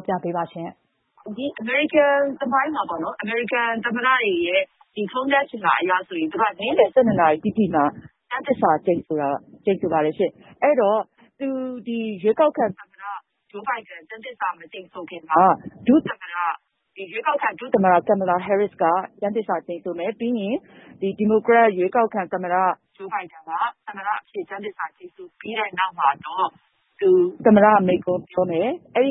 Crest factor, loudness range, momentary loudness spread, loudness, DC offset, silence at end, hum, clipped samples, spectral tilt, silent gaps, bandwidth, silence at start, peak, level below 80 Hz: 20 dB; 6 LU; 14 LU; -21 LUFS; under 0.1%; 0 s; none; under 0.1%; -10.5 dB/octave; none; 4 kHz; 0 s; -2 dBFS; -64 dBFS